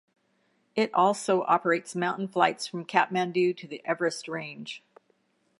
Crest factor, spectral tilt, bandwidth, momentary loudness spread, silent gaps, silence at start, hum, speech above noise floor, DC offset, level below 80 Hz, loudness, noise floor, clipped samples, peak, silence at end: 24 dB; -4.5 dB/octave; 11.5 kHz; 12 LU; none; 0.75 s; none; 44 dB; under 0.1%; -84 dBFS; -27 LUFS; -70 dBFS; under 0.1%; -6 dBFS; 0.8 s